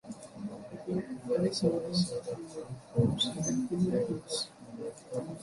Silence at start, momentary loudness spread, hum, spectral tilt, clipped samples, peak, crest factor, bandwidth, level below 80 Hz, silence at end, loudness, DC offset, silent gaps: 0.05 s; 13 LU; none; -5.5 dB/octave; under 0.1%; -14 dBFS; 18 dB; 11.5 kHz; -60 dBFS; 0 s; -33 LUFS; under 0.1%; none